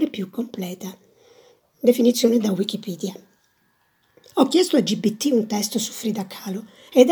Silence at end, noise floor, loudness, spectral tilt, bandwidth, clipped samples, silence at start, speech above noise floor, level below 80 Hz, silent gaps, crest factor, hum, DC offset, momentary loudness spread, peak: 0 s; -65 dBFS; -22 LUFS; -4.5 dB/octave; over 20 kHz; under 0.1%; 0 s; 44 dB; -76 dBFS; none; 22 dB; none; under 0.1%; 14 LU; 0 dBFS